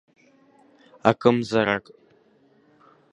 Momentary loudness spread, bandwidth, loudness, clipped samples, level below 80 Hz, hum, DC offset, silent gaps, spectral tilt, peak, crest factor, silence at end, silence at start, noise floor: 5 LU; 10.5 kHz; -22 LUFS; under 0.1%; -64 dBFS; none; under 0.1%; none; -6.5 dB/octave; 0 dBFS; 26 dB; 1.3 s; 1.05 s; -59 dBFS